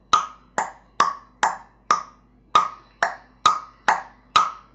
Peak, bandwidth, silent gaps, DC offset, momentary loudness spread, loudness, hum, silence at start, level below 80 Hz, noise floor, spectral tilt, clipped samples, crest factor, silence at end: -4 dBFS; 9.4 kHz; none; under 0.1%; 9 LU; -23 LUFS; none; 0.15 s; -58 dBFS; -51 dBFS; -1 dB/octave; under 0.1%; 22 dB; 0.2 s